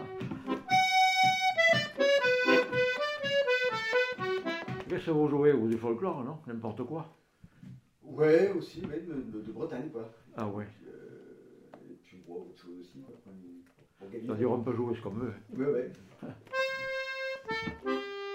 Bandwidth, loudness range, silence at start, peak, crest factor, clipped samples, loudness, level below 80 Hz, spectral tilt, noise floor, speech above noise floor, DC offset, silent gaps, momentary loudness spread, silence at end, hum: 16 kHz; 18 LU; 0 s; -12 dBFS; 20 dB; under 0.1%; -30 LUFS; -68 dBFS; -4.5 dB/octave; -56 dBFS; 23 dB; under 0.1%; none; 21 LU; 0 s; none